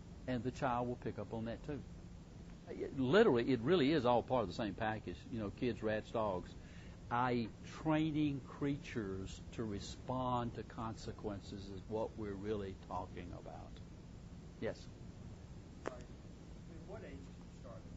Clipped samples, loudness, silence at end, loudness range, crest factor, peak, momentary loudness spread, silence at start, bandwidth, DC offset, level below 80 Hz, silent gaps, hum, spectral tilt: under 0.1%; -39 LUFS; 0 s; 15 LU; 22 dB; -18 dBFS; 21 LU; 0 s; 7.6 kHz; under 0.1%; -58 dBFS; none; none; -5.5 dB/octave